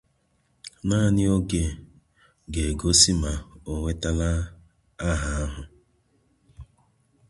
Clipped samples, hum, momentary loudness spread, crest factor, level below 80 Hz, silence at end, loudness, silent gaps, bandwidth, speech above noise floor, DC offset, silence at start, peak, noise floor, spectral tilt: under 0.1%; none; 18 LU; 24 dB; -34 dBFS; 0.65 s; -24 LUFS; none; 11.5 kHz; 44 dB; under 0.1%; 0.65 s; -2 dBFS; -68 dBFS; -4 dB/octave